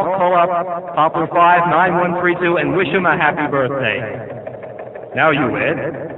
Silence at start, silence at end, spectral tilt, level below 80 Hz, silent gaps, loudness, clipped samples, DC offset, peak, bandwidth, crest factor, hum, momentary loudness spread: 0 s; 0 s; -8.5 dB/octave; -52 dBFS; none; -15 LUFS; under 0.1%; under 0.1%; 0 dBFS; 4.1 kHz; 16 dB; none; 16 LU